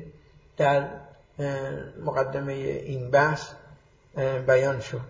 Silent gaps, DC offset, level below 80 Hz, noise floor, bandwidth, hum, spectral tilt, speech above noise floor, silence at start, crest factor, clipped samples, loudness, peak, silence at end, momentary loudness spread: none; under 0.1%; -56 dBFS; -54 dBFS; 7.6 kHz; none; -6.5 dB/octave; 28 dB; 0 s; 20 dB; under 0.1%; -26 LUFS; -6 dBFS; 0 s; 17 LU